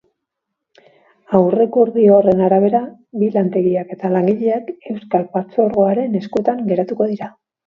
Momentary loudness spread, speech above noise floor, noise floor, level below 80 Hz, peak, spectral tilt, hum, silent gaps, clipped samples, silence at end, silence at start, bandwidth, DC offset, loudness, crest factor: 9 LU; 63 dB; -78 dBFS; -60 dBFS; 0 dBFS; -10.5 dB/octave; none; none; under 0.1%; 0.35 s; 1.3 s; 5.8 kHz; under 0.1%; -16 LUFS; 16 dB